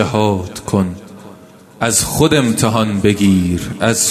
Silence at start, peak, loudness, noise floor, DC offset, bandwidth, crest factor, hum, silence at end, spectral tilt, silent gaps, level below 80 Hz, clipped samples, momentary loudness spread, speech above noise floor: 0 s; 0 dBFS; -15 LUFS; -40 dBFS; under 0.1%; 14 kHz; 16 dB; none; 0 s; -4.5 dB/octave; none; -42 dBFS; under 0.1%; 8 LU; 26 dB